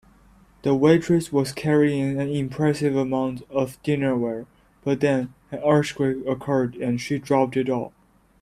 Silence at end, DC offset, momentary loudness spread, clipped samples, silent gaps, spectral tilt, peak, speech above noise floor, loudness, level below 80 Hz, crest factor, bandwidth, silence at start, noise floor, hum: 0.55 s; under 0.1%; 8 LU; under 0.1%; none; -7 dB/octave; -4 dBFS; 32 dB; -23 LUFS; -56 dBFS; 20 dB; 14 kHz; 0.65 s; -54 dBFS; none